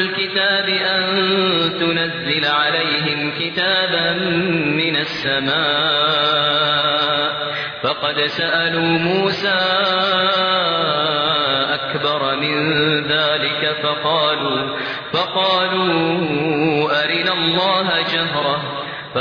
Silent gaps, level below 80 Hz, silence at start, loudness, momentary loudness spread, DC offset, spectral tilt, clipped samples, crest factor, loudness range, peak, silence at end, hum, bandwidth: none; -56 dBFS; 0 s; -17 LUFS; 4 LU; under 0.1%; -6 dB/octave; under 0.1%; 14 dB; 1 LU; -4 dBFS; 0 s; none; 5.4 kHz